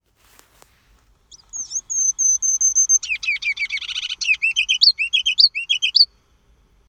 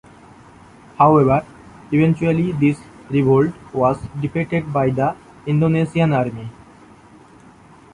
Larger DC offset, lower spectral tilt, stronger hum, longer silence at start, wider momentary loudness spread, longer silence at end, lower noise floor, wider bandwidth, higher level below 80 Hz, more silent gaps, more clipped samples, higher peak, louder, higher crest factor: neither; second, 6 dB/octave vs -9 dB/octave; neither; first, 1.55 s vs 1 s; about the same, 11 LU vs 10 LU; second, 0.85 s vs 1.4 s; first, -57 dBFS vs -46 dBFS; first, 15 kHz vs 10.5 kHz; second, -58 dBFS vs -48 dBFS; neither; neither; about the same, 0 dBFS vs -2 dBFS; about the same, -16 LUFS vs -18 LUFS; about the same, 20 dB vs 18 dB